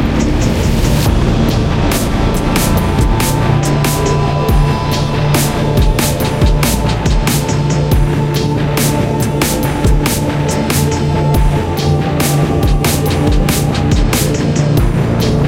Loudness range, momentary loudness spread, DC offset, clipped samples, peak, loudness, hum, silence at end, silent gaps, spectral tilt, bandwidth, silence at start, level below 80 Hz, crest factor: 1 LU; 2 LU; under 0.1%; under 0.1%; 0 dBFS; -13 LUFS; none; 0 s; none; -5.5 dB/octave; 17 kHz; 0 s; -18 dBFS; 12 dB